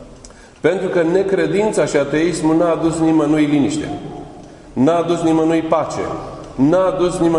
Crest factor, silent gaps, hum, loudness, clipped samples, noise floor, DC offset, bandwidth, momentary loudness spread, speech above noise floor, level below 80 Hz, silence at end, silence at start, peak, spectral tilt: 16 dB; none; none; -16 LUFS; under 0.1%; -40 dBFS; under 0.1%; 11 kHz; 13 LU; 25 dB; -44 dBFS; 0 s; 0 s; 0 dBFS; -6 dB/octave